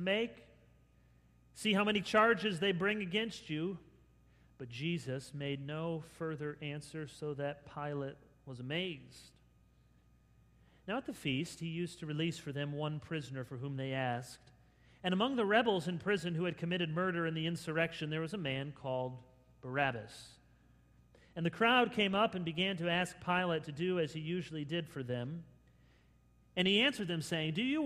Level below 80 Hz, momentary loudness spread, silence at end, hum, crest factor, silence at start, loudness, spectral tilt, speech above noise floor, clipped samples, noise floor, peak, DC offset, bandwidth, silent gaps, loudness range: -68 dBFS; 14 LU; 0 s; none; 24 dB; 0 s; -36 LUFS; -5.5 dB/octave; 31 dB; under 0.1%; -67 dBFS; -14 dBFS; under 0.1%; 14.5 kHz; none; 9 LU